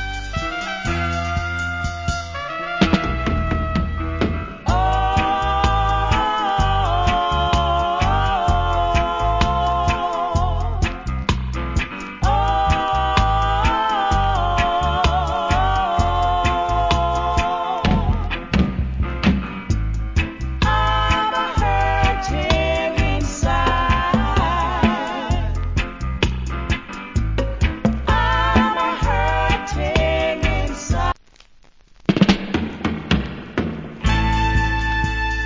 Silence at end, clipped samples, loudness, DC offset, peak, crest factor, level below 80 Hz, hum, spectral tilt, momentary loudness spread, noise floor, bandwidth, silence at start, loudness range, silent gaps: 0 s; under 0.1%; -20 LUFS; under 0.1%; 0 dBFS; 20 dB; -24 dBFS; none; -5.5 dB/octave; 7 LU; -48 dBFS; 7.6 kHz; 0 s; 3 LU; none